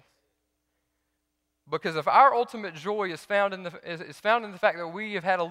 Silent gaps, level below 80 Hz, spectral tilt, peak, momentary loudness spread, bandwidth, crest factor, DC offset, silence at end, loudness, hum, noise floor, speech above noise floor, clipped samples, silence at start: none; -74 dBFS; -5 dB/octave; -6 dBFS; 16 LU; 15 kHz; 22 dB; under 0.1%; 0 s; -26 LUFS; none; -79 dBFS; 53 dB; under 0.1%; 1.7 s